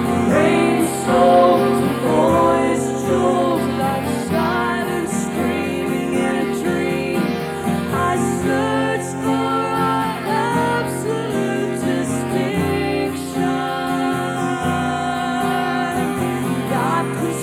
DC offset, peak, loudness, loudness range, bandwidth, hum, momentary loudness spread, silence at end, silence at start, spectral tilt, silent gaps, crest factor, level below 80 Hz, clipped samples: under 0.1%; -4 dBFS; -19 LUFS; 5 LU; 17 kHz; none; 6 LU; 0 s; 0 s; -5.5 dB/octave; none; 14 dB; -48 dBFS; under 0.1%